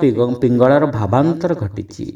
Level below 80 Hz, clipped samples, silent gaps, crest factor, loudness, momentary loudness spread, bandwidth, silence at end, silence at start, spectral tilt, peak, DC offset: -48 dBFS; under 0.1%; none; 14 dB; -16 LUFS; 11 LU; 9.6 kHz; 0 s; 0 s; -8.5 dB/octave; 0 dBFS; under 0.1%